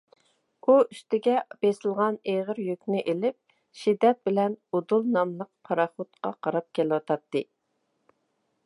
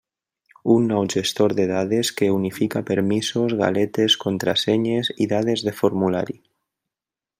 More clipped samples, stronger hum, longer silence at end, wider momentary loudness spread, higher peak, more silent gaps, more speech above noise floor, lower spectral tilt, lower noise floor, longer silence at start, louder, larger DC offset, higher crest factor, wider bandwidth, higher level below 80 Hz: neither; neither; about the same, 1.2 s vs 1.1 s; first, 9 LU vs 4 LU; second, -8 dBFS vs -4 dBFS; neither; second, 50 dB vs 69 dB; first, -7 dB/octave vs -5 dB/octave; second, -76 dBFS vs -89 dBFS; about the same, 0.65 s vs 0.65 s; second, -27 LUFS vs -21 LUFS; neither; about the same, 20 dB vs 18 dB; second, 11.5 kHz vs 16 kHz; second, -82 dBFS vs -64 dBFS